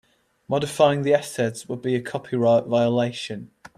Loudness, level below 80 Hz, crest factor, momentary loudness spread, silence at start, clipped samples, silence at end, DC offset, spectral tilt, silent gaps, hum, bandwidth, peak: -22 LUFS; -64 dBFS; 18 dB; 10 LU; 0.5 s; under 0.1%; 0.3 s; under 0.1%; -6 dB/octave; none; none; 14 kHz; -4 dBFS